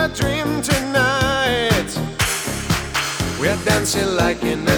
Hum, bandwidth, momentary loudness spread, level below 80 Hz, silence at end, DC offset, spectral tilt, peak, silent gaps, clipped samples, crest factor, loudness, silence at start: none; over 20 kHz; 5 LU; -36 dBFS; 0 s; under 0.1%; -4 dB/octave; -2 dBFS; none; under 0.1%; 18 dB; -19 LUFS; 0 s